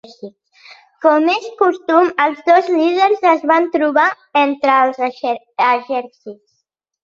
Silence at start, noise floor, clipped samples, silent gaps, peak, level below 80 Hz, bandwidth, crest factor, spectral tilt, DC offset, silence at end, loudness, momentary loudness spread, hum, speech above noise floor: 0.25 s; -71 dBFS; under 0.1%; none; -2 dBFS; -68 dBFS; 7.4 kHz; 14 dB; -4 dB/octave; under 0.1%; 0.7 s; -15 LUFS; 9 LU; none; 56 dB